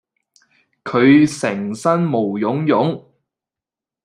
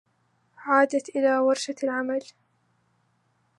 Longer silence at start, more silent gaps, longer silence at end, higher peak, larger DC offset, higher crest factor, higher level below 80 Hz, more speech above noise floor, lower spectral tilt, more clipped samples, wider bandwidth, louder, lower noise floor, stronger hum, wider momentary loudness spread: first, 0.85 s vs 0.6 s; neither; second, 1.05 s vs 1.35 s; first, -2 dBFS vs -6 dBFS; neither; about the same, 16 dB vs 20 dB; first, -60 dBFS vs -84 dBFS; first, 72 dB vs 45 dB; first, -6.5 dB/octave vs -2.5 dB/octave; neither; about the same, 11 kHz vs 11.5 kHz; first, -17 LUFS vs -24 LUFS; first, -88 dBFS vs -69 dBFS; neither; about the same, 10 LU vs 9 LU